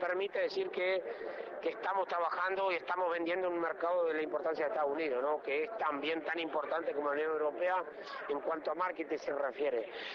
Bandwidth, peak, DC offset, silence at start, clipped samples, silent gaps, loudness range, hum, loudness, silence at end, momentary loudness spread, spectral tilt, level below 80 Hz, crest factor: 6.8 kHz; -22 dBFS; under 0.1%; 0 s; under 0.1%; none; 2 LU; none; -35 LUFS; 0 s; 5 LU; -5 dB/octave; -80 dBFS; 12 dB